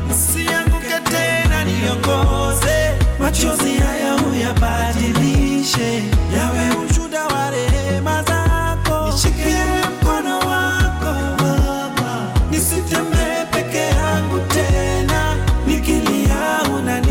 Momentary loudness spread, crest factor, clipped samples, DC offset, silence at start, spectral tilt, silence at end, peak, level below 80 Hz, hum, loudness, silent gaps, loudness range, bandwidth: 3 LU; 10 dB; under 0.1%; under 0.1%; 0 s; -4.5 dB/octave; 0 s; -6 dBFS; -22 dBFS; none; -17 LUFS; none; 1 LU; 17 kHz